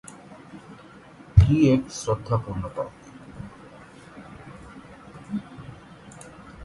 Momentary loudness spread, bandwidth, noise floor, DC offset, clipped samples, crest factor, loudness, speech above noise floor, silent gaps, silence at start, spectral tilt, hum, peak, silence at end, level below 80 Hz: 27 LU; 11.5 kHz; -47 dBFS; under 0.1%; under 0.1%; 24 dB; -23 LUFS; 24 dB; none; 0.3 s; -7.5 dB/octave; none; -2 dBFS; 0 s; -36 dBFS